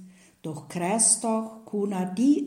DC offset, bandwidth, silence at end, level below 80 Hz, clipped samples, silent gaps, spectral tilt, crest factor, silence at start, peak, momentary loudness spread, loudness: under 0.1%; 15.5 kHz; 0 s; -74 dBFS; under 0.1%; none; -4 dB/octave; 18 dB; 0 s; -8 dBFS; 18 LU; -24 LUFS